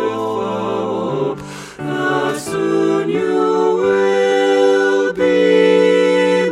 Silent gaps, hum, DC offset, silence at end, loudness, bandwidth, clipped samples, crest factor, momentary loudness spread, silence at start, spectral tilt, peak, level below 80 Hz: none; none; under 0.1%; 0 s; -15 LUFS; 14 kHz; under 0.1%; 14 dB; 8 LU; 0 s; -5.5 dB/octave; 0 dBFS; -56 dBFS